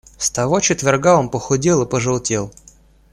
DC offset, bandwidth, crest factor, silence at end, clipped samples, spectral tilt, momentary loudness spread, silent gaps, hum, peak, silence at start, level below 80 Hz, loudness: under 0.1%; 14 kHz; 16 dB; 0.6 s; under 0.1%; -4.5 dB/octave; 7 LU; none; none; -2 dBFS; 0.2 s; -46 dBFS; -17 LUFS